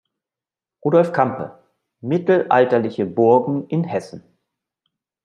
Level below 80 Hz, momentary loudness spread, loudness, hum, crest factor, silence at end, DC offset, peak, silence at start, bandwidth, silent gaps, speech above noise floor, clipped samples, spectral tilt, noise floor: -68 dBFS; 15 LU; -18 LUFS; none; 18 dB; 1.05 s; under 0.1%; -2 dBFS; 0.85 s; 9.6 kHz; none; 72 dB; under 0.1%; -8.5 dB/octave; -89 dBFS